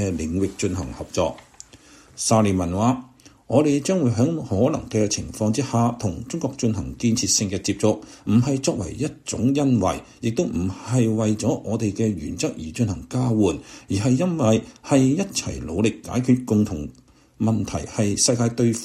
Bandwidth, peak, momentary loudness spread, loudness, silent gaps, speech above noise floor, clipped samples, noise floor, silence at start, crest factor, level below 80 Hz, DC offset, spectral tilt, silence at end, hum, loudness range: 14 kHz; -6 dBFS; 8 LU; -22 LUFS; none; 27 dB; under 0.1%; -49 dBFS; 0 s; 16 dB; -46 dBFS; under 0.1%; -5.5 dB/octave; 0 s; none; 2 LU